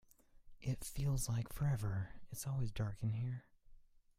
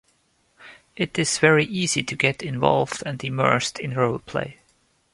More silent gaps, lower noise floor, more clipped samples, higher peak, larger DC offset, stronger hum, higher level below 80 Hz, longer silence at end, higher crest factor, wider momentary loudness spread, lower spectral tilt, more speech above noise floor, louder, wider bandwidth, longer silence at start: neither; about the same, -62 dBFS vs -65 dBFS; neither; second, -26 dBFS vs -2 dBFS; neither; neither; about the same, -54 dBFS vs -58 dBFS; second, 0.4 s vs 0.6 s; second, 14 dB vs 22 dB; about the same, 9 LU vs 11 LU; first, -6 dB/octave vs -4 dB/octave; second, 23 dB vs 43 dB; second, -41 LUFS vs -22 LUFS; first, 16 kHz vs 11.5 kHz; second, 0.35 s vs 0.6 s